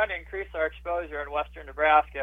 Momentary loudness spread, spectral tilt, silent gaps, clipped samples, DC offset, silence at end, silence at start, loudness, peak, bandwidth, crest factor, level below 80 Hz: 12 LU; -6 dB/octave; none; under 0.1%; under 0.1%; 0 s; 0 s; -28 LUFS; -8 dBFS; 4.1 kHz; 20 dB; -46 dBFS